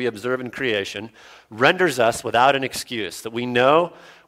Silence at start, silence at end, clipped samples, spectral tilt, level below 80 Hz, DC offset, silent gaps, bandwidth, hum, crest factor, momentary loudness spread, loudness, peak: 0 s; 0.35 s; under 0.1%; -4 dB/octave; -60 dBFS; under 0.1%; none; 16.5 kHz; none; 20 dB; 12 LU; -20 LUFS; 0 dBFS